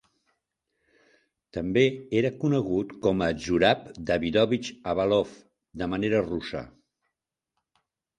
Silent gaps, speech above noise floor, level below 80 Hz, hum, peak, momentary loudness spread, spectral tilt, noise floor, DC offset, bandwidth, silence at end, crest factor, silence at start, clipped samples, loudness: none; 60 dB; -52 dBFS; none; -6 dBFS; 11 LU; -6 dB/octave; -85 dBFS; under 0.1%; 10.5 kHz; 1.5 s; 22 dB; 1.55 s; under 0.1%; -26 LUFS